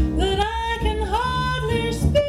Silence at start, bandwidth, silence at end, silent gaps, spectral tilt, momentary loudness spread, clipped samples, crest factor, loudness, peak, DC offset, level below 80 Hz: 0 s; 14 kHz; 0 s; none; -5.5 dB/octave; 2 LU; under 0.1%; 14 dB; -22 LUFS; -6 dBFS; under 0.1%; -28 dBFS